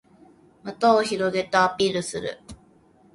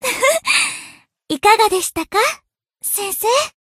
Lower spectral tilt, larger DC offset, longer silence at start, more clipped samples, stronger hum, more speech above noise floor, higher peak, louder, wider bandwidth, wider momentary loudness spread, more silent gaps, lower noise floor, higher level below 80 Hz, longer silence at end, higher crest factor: first, -4 dB/octave vs -0.5 dB/octave; neither; first, 0.65 s vs 0 s; neither; neither; first, 34 dB vs 25 dB; second, -6 dBFS vs 0 dBFS; second, -22 LUFS vs -16 LUFS; second, 11.5 kHz vs 15.5 kHz; first, 19 LU vs 13 LU; neither; first, -56 dBFS vs -42 dBFS; about the same, -58 dBFS vs -54 dBFS; first, 0.6 s vs 0.25 s; about the same, 20 dB vs 18 dB